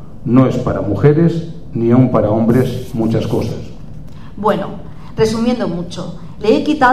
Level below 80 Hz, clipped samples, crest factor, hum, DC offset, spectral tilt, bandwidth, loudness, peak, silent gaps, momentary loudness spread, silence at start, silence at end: -38 dBFS; under 0.1%; 16 dB; none; 3%; -7.5 dB/octave; 14.5 kHz; -15 LUFS; 0 dBFS; none; 18 LU; 0 s; 0 s